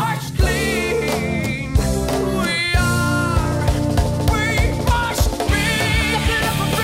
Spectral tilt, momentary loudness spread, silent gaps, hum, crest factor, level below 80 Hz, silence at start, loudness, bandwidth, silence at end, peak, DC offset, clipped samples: -5 dB/octave; 3 LU; none; none; 14 dB; -24 dBFS; 0 s; -19 LUFS; 16.5 kHz; 0 s; -4 dBFS; under 0.1%; under 0.1%